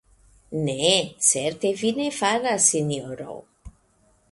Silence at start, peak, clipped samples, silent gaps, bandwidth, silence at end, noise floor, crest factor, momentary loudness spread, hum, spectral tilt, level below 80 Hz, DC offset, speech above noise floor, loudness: 0.5 s; -4 dBFS; under 0.1%; none; 11.5 kHz; 0.6 s; -62 dBFS; 22 dB; 16 LU; none; -2.5 dB/octave; -56 dBFS; under 0.1%; 39 dB; -22 LUFS